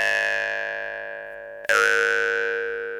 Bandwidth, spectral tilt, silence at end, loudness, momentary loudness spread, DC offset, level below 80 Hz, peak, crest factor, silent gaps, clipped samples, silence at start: 16 kHz; -0.5 dB/octave; 0 s; -22 LUFS; 15 LU; under 0.1%; -62 dBFS; -4 dBFS; 20 dB; none; under 0.1%; 0 s